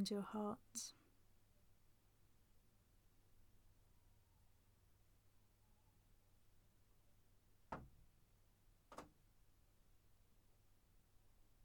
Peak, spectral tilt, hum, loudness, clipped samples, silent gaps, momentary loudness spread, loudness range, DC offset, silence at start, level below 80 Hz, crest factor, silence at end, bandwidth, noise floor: -34 dBFS; -4.5 dB/octave; none; -50 LUFS; under 0.1%; none; 18 LU; 15 LU; under 0.1%; 0 s; -76 dBFS; 24 dB; 0 s; 19 kHz; -74 dBFS